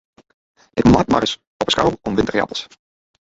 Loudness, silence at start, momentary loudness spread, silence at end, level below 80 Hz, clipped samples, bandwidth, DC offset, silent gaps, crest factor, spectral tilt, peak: -18 LUFS; 0.75 s; 11 LU; 0.6 s; -38 dBFS; under 0.1%; 8 kHz; under 0.1%; 1.47-1.59 s; 18 dB; -5.5 dB/octave; -2 dBFS